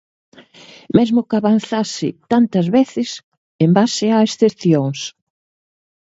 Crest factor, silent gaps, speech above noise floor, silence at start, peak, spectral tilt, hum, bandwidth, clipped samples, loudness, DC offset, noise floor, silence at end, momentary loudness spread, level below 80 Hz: 16 dB; 3.23-3.59 s; 28 dB; 0.95 s; 0 dBFS; -6 dB/octave; none; 8 kHz; under 0.1%; -16 LUFS; under 0.1%; -43 dBFS; 1 s; 10 LU; -58 dBFS